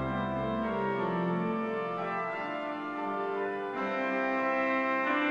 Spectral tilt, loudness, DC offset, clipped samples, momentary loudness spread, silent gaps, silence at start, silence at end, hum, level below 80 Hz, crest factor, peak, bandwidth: -7.5 dB/octave; -32 LUFS; under 0.1%; under 0.1%; 6 LU; none; 0 s; 0 s; none; -58 dBFS; 14 dB; -18 dBFS; 9 kHz